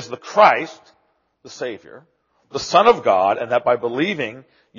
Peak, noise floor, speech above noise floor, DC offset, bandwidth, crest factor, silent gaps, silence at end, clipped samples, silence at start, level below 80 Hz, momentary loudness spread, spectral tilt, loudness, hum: 0 dBFS; -65 dBFS; 46 dB; under 0.1%; 7.2 kHz; 20 dB; none; 0.4 s; under 0.1%; 0 s; -62 dBFS; 16 LU; -2 dB/octave; -17 LUFS; none